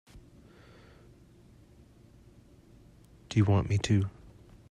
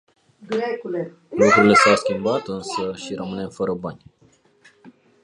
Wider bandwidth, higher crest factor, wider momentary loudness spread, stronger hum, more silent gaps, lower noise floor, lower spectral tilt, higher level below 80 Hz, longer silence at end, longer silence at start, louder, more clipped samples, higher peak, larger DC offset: about the same, 10.5 kHz vs 11 kHz; about the same, 20 dB vs 20 dB; second, 6 LU vs 17 LU; neither; neither; about the same, -57 dBFS vs -57 dBFS; first, -6.5 dB/octave vs -4.5 dB/octave; about the same, -56 dBFS vs -58 dBFS; first, 0.6 s vs 0.35 s; second, 0.15 s vs 0.4 s; second, -29 LUFS vs -20 LUFS; neither; second, -14 dBFS vs -2 dBFS; neither